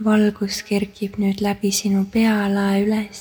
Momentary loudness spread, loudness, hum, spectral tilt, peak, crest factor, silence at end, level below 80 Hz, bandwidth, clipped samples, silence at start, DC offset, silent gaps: 5 LU; -20 LUFS; none; -5 dB/octave; -6 dBFS; 14 dB; 0 s; -50 dBFS; over 20 kHz; under 0.1%; 0 s; under 0.1%; none